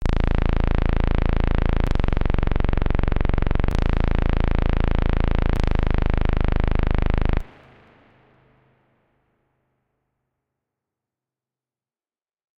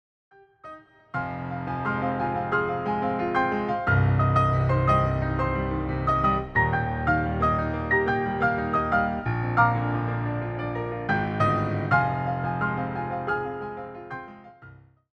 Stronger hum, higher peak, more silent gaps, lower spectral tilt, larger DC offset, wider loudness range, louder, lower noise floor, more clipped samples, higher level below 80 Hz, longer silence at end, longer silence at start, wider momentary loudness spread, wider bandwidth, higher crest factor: neither; about the same, -6 dBFS vs -8 dBFS; neither; about the same, -8.5 dB/octave vs -9 dB/octave; neither; about the same, 6 LU vs 4 LU; about the same, -24 LUFS vs -25 LUFS; first, under -90 dBFS vs -50 dBFS; neither; first, -22 dBFS vs -40 dBFS; first, 5.1 s vs 0.45 s; second, 0 s vs 0.65 s; second, 1 LU vs 11 LU; second, 5.4 kHz vs 6.2 kHz; about the same, 14 dB vs 18 dB